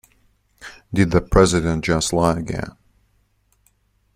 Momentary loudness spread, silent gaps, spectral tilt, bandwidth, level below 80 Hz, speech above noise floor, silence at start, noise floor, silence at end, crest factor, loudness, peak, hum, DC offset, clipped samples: 23 LU; none; -5.5 dB/octave; 15.5 kHz; -34 dBFS; 45 dB; 0.6 s; -63 dBFS; 1.45 s; 20 dB; -19 LUFS; -2 dBFS; 50 Hz at -45 dBFS; under 0.1%; under 0.1%